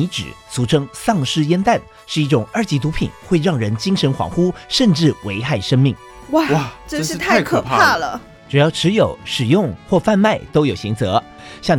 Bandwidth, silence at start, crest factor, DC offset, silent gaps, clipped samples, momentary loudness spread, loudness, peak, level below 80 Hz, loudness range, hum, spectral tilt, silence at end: 18 kHz; 0 s; 14 dB; under 0.1%; none; under 0.1%; 9 LU; -17 LUFS; -2 dBFS; -42 dBFS; 2 LU; none; -5.5 dB/octave; 0 s